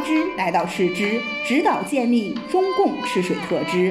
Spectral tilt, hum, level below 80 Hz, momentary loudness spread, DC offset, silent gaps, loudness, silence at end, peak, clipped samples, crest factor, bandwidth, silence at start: -5.5 dB/octave; none; -60 dBFS; 4 LU; under 0.1%; none; -21 LUFS; 0 s; -6 dBFS; under 0.1%; 14 dB; 14 kHz; 0 s